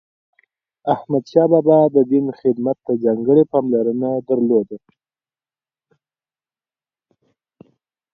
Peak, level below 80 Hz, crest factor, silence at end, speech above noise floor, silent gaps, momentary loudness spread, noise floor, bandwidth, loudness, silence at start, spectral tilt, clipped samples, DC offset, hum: 0 dBFS; -66 dBFS; 18 dB; 3.35 s; over 74 dB; none; 9 LU; under -90 dBFS; 6.4 kHz; -17 LUFS; 0.85 s; -10 dB/octave; under 0.1%; under 0.1%; none